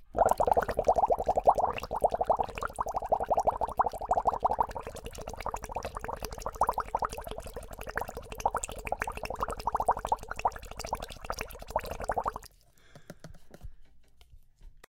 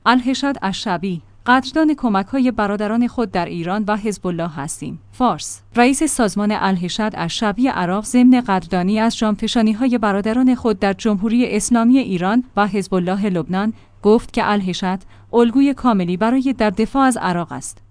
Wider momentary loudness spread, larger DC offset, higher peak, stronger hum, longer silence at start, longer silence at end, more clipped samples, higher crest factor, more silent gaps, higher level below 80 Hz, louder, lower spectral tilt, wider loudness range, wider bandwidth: first, 15 LU vs 8 LU; neither; second, -10 dBFS vs 0 dBFS; neither; about the same, 0 s vs 0.05 s; about the same, 0.1 s vs 0.2 s; neither; first, 22 dB vs 16 dB; neither; about the same, -46 dBFS vs -44 dBFS; second, -32 LUFS vs -18 LUFS; about the same, -4 dB/octave vs -5 dB/octave; first, 10 LU vs 3 LU; first, 17 kHz vs 10.5 kHz